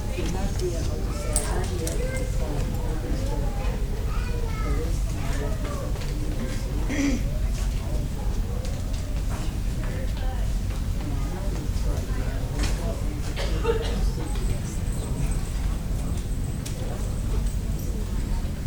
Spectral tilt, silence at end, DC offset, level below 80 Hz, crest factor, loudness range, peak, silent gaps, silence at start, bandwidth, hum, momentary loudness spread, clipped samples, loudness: -5.5 dB/octave; 0 s; under 0.1%; -28 dBFS; 22 dB; 2 LU; -2 dBFS; none; 0 s; over 20 kHz; none; 4 LU; under 0.1%; -29 LUFS